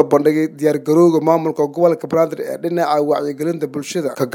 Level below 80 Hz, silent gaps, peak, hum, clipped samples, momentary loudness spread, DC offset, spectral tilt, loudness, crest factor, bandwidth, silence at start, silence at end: -66 dBFS; none; 0 dBFS; none; under 0.1%; 9 LU; under 0.1%; -6.5 dB/octave; -17 LUFS; 16 dB; 17 kHz; 0 s; 0 s